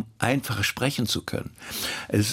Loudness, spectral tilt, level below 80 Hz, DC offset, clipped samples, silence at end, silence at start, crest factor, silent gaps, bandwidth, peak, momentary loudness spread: -27 LUFS; -4 dB/octave; -56 dBFS; under 0.1%; under 0.1%; 0 s; 0 s; 24 dB; none; 17 kHz; -4 dBFS; 9 LU